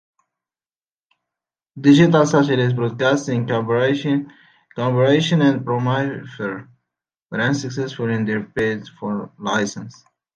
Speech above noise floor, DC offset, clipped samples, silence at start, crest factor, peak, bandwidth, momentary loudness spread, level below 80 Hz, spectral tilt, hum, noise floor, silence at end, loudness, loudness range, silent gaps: over 72 dB; under 0.1%; under 0.1%; 1.75 s; 18 dB; -2 dBFS; 9 kHz; 13 LU; -60 dBFS; -6.5 dB/octave; none; under -90 dBFS; 0.45 s; -19 LUFS; 6 LU; 7.22-7.26 s